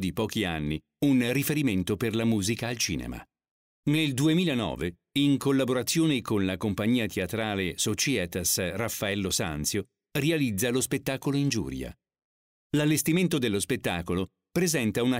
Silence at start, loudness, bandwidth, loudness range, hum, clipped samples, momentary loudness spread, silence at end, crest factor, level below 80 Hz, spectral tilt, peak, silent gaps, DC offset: 0 s; -27 LUFS; 16 kHz; 2 LU; none; under 0.1%; 7 LU; 0 s; 14 dB; -52 dBFS; -4.5 dB/octave; -14 dBFS; 3.51-3.83 s, 12.24-12.70 s; under 0.1%